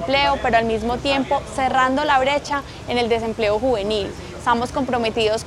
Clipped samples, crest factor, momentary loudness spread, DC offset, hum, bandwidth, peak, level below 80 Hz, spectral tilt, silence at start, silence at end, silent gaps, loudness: under 0.1%; 16 dB; 7 LU; under 0.1%; none; 13 kHz; -4 dBFS; -40 dBFS; -4.5 dB/octave; 0 s; 0 s; none; -20 LUFS